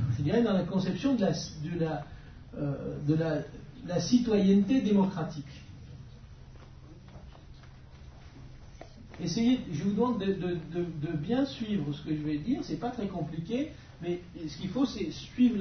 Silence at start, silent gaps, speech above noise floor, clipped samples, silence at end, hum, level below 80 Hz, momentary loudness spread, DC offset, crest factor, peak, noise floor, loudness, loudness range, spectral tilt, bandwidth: 0 s; none; 20 dB; under 0.1%; 0 s; none; -52 dBFS; 24 LU; under 0.1%; 18 dB; -14 dBFS; -50 dBFS; -30 LUFS; 15 LU; -7 dB/octave; 6.6 kHz